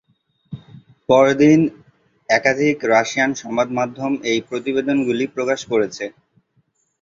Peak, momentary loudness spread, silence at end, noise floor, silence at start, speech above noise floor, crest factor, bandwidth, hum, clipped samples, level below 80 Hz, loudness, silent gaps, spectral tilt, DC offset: -2 dBFS; 17 LU; 0.95 s; -64 dBFS; 0.5 s; 47 dB; 18 dB; 7.6 kHz; none; under 0.1%; -60 dBFS; -18 LUFS; none; -5 dB/octave; under 0.1%